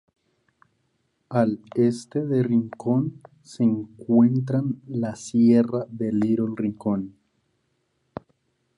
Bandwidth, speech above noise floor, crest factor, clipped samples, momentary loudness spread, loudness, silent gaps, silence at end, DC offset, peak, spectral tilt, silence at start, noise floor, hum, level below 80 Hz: 10.5 kHz; 49 dB; 18 dB; under 0.1%; 11 LU; -23 LUFS; none; 1.7 s; under 0.1%; -6 dBFS; -8.5 dB/octave; 1.3 s; -72 dBFS; none; -64 dBFS